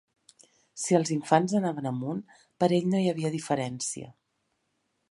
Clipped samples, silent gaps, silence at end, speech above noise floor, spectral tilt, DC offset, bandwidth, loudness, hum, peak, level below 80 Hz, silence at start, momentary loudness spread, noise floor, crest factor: under 0.1%; none; 1 s; 50 dB; -5.5 dB/octave; under 0.1%; 11.5 kHz; -28 LUFS; none; -6 dBFS; -72 dBFS; 0.75 s; 12 LU; -77 dBFS; 24 dB